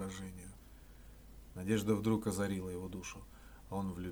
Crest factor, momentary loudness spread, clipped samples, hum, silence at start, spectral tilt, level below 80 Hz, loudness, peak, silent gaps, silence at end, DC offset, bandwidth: 18 dB; 24 LU; under 0.1%; none; 0 s; -6 dB/octave; -56 dBFS; -38 LUFS; -20 dBFS; none; 0 s; under 0.1%; over 20 kHz